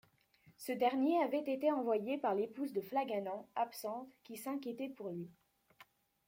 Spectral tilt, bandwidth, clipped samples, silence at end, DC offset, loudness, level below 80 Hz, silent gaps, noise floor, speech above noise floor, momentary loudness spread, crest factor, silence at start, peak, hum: -5.5 dB/octave; 16.5 kHz; under 0.1%; 0.45 s; under 0.1%; -38 LUFS; -86 dBFS; none; -69 dBFS; 32 dB; 14 LU; 18 dB; 0.45 s; -20 dBFS; none